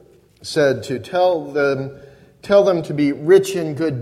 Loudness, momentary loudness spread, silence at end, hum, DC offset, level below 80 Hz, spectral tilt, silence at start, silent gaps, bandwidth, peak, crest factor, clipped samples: -18 LUFS; 10 LU; 0 s; none; under 0.1%; -56 dBFS; -6 dB/octave; 0.45 s; none; 14 kHz; -2 dBFS; 16 dB; under 0.1%